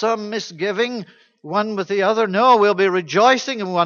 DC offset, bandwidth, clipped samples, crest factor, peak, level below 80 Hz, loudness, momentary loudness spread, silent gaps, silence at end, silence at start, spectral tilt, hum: under 0.1%; 7.2 kHz; under 0.1%; 16 dB; -2 dBFS; -72 dBFS; -18 LUFS; 10 LU; none; 0 s; 0 s; -4.5 dB/octave; none